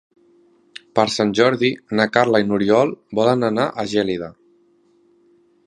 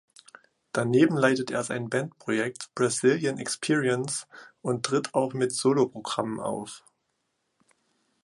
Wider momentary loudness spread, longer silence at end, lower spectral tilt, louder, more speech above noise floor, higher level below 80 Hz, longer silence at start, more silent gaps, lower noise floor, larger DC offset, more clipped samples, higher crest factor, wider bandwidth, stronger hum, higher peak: second, 6 LU vs 11 LU; about the same, 1.35 s vs 1.45 s; about the same, -5.5 dB/octave vs -4.5 dB/octave; first, -18 LUFS vs -27 LUFS; second, 40 dB vs 51 dB; first, -58 dBFS vs -70 dBFS; first, 0.95 s vs 0.75 s; neither; second, -57 dBFS vs -77 dBFS; neither; neither; about the same, 20 dB vs 20 dB; about the same, 11.5 kHz vs 11.5 kHz; neither; first, 0 dBFS vs -8 dBFS